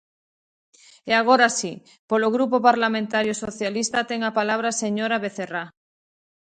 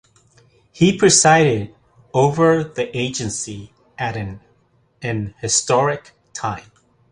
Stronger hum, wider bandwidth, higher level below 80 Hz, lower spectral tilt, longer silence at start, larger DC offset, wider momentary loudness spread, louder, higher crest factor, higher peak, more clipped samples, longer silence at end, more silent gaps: neither; second, 9.4 kHz vs 11.5 kHz; second, -66 dBFS vs -50 dBFS; about the same, -3 dB/octave vs -4 dB/octave; first, 1.05 s vs 0.75 s; neither; second, 13 LU vs 18 LU; second, -22 LUFS vs -18 LUFS; about the same, 22 dB vs 18 dB; about the same, -2 dBFS vs 0 dBFS; neither; first, 0.9 s vs 0.5 s; first, 1.99-2.08 s vs none